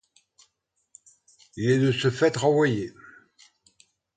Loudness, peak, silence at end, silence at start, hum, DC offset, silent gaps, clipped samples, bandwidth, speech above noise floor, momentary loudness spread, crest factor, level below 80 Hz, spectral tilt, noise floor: -23 LUFS; -8 dBFS; 1.25 s; 1.55 s; none; under 0.1%; none; under 0.1%; 9.4 kHz; 52 dB; 13 LU; 18 dB; -62 dBFS; -6 dB/octave; -75 dBFS